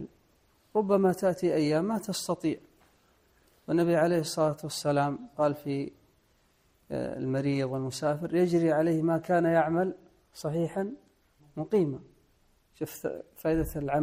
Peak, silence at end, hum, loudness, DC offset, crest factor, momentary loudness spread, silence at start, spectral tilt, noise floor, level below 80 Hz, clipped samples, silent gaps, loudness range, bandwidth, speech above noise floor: -12 dBFS; 0 s; none; -29 LUFS; under 0.1%; 16 dB; 13 LU; 0 s; -6.5 dB/octave; -67 dBFS; -56 dBFS; under 0.1%; none; 6 LU; 15.5 kHz; 39 dB